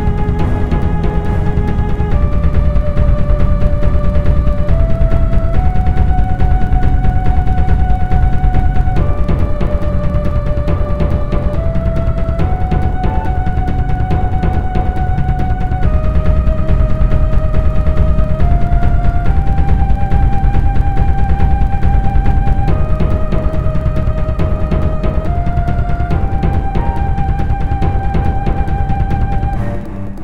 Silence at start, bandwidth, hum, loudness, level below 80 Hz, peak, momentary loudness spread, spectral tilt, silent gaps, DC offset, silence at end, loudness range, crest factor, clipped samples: 0 s; 4.8 kHz; none; -16 LUFS; -14 dBFS; 0 dBFS; 3 LU; -9.5 dB/octave; none; 9%; 0 s; 2 LU; 12 dB; under 0.1%